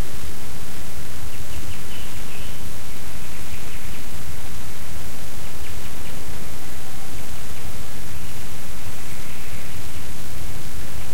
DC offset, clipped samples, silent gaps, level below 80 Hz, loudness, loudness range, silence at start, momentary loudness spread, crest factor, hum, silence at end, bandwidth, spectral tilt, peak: 30%; under 0.1%; none; -40 dBFS; -35 LUFS; 0 LU; 0 s; 1 LU; 16 dB; none; 0 s; 16.5 kHz; -4 dB/octave; -8 dBFS